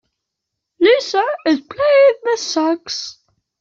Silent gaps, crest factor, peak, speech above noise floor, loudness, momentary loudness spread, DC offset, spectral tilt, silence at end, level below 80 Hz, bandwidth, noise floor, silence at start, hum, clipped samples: none; 14 dB; -2 dBFS; 60 dB; -16 LUFS; 12 LU; under 0.1%; -2 dB/octave; 0.5 s; -62 dBFS; 7.6 kHz; -79 dBFS; 0.8 s; none; under 0.1%